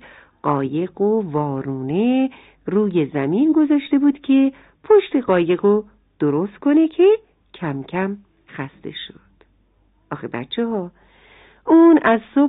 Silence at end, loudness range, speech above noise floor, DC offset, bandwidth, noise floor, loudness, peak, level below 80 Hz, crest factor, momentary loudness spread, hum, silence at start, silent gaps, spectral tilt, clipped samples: 0 s; 12 LU; 42 dB; under 0.1%; 4 kHz; -59 dBFS; -18 LUFS; -4 dBFS; -58 dBFS; 16 dB; 17 LU; none; 0.45 s; none; -11.5 dB/octave; under 0.1%